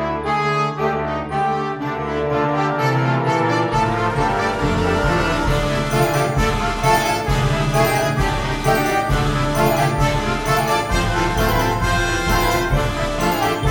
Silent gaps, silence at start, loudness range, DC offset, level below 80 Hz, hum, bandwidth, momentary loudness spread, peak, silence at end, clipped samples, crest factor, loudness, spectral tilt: none; 0 s; 1 LU; under 0.1%; -28 dBFS; none; over 20 kHz; 4 LU; -2 dBFS; 0 s; under 0.1%; 16 dB; -19 LUFS; -5 dB/octave